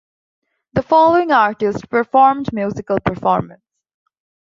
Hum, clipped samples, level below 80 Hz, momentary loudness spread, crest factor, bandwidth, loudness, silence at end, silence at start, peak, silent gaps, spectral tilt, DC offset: none; under 0.1%; -48 dBFS; 11 LU; 16 dB; 7.4 kHz; -16 LUFS; 1 s; 0.75 s; -2 dBFS; none; -7.5 dB/octave; under 0.1%